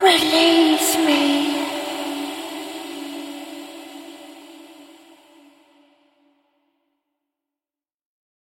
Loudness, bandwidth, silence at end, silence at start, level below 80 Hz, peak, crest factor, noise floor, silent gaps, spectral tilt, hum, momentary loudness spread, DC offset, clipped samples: -19 LUFS; 16.5 kHz; 3.65 s; 0 s; -68 dBFS; -2 dBFS; 22 dB; under -90 dBFS; none; -1.5 dB/octave; none; 24 LU; under 0.1%; under 0.1%